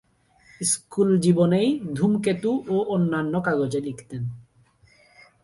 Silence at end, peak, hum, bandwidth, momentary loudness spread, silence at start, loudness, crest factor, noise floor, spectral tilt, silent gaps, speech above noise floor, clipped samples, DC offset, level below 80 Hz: 1 s; -6 dBFS; none; 11.5 kHz; 13 LU; 0.6 s; -23 LUFS; 18 dB; -58 dBFS; -6 dB/octave; none; 36 dB; under 0.1%; under 0.1%; -60 dBFS